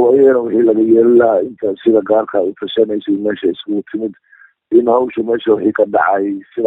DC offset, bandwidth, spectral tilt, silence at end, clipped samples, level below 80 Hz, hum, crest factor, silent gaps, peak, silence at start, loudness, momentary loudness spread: under 0.1%; 3.9 kHz; -8.5 dB/octave; 0 s; under 0.1%; -58 dBFS; none; 14 dB; none; 0 dBFS; 0 s; -14 LUFS; 10 LU